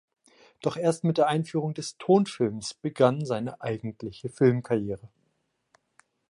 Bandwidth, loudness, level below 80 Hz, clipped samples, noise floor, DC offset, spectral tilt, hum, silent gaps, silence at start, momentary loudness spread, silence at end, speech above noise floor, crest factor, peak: 11.5 kHz; -27 LUFS; -64 dBFS; under 0.1%; -75 dBFS; under 0.1%; -6.5 dB/octave; none; none; 0.65 s; 12 LU; 1.2 s; 49 dB; 20 dB; -8 dBFS